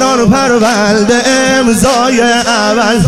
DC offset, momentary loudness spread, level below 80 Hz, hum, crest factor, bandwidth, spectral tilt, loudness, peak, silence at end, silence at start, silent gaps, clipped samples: 1%; 1 LU; -34 dBFS; none; 8 dB; 16 kHz; -4 dB/octave; -9 LUFS; 0 dBFS; 0 s; 0 s; none; under 0.1%